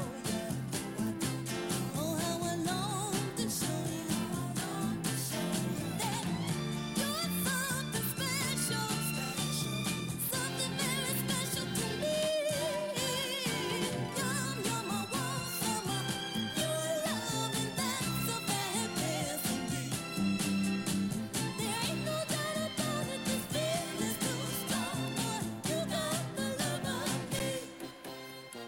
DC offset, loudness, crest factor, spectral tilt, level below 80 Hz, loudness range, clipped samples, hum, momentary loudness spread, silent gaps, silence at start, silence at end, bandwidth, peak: under 0.1%; -34 LUFS; 16 dB; -3.5 dB/octave; -62 dBFS; 2 LU; under 0.1%; none; 4 LU; none; 0 s; 0 s; 17 kHz; -18 dBFS